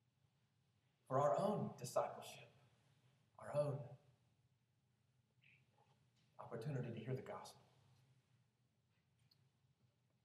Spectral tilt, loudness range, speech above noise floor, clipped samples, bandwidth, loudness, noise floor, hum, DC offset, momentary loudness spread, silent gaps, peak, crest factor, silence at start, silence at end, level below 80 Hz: -6.5 dB/octave; 11 LU; 40 dB; under 0.1%; 13.5 kHz; -44 LUFS; -82 dBFS; none; under 0.1%; 20 LU; none; -28 dBFS; 22 dB; 1.1 s; 2.65 s; under -90 dBFS